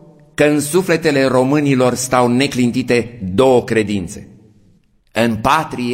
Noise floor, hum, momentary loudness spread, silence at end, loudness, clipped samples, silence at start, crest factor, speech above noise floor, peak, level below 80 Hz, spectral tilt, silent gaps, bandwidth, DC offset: -53 dBFS; none; 8 LU; 0 s; -15 LUFS; under 0.1%; 0.4 s; 16 dB; 38 dB; 0 dBFS; -46 dBFS; -5 dB/octave; none; 16.5 kHz; under 0.1%